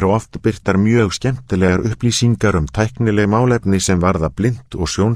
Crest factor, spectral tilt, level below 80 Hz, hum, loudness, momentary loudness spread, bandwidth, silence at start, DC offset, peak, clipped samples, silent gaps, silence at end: 16 dB; -6 dB/octave; -34 dBFS; none; -16 LUFS; 6 LU; 13.5 kHz; 0 s; under 0.1%; 0 dBFS; under 0.1%; none; 0 s